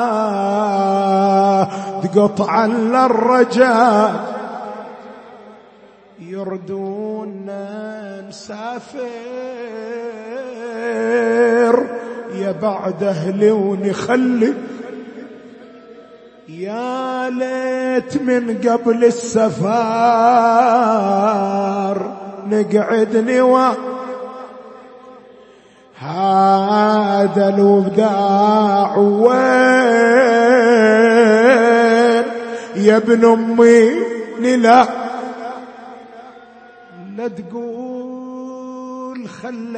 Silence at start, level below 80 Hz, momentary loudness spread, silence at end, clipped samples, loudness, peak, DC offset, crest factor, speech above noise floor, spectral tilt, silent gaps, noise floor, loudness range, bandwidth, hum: 0 s; -64 dBFS; 18 LU; 0 s; under 0.1%; -14 LUFS; 0 dBFS; under 0.1%; 16 dB; 32 dB; -6 dB/octave; none; -46 dBFS; 17 LU; 8.8 kHz; none